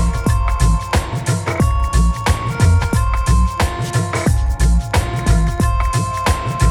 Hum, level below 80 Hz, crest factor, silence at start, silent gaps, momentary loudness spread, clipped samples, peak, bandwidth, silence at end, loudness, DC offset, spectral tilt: none; -18 dBFS; 14 dB; 0 s; none; 3 LU; under 0.1%; -2 dBFS; 14.5 kHz; 0 s; -17 LUFS; under 0.1%; -5.5 dB/octave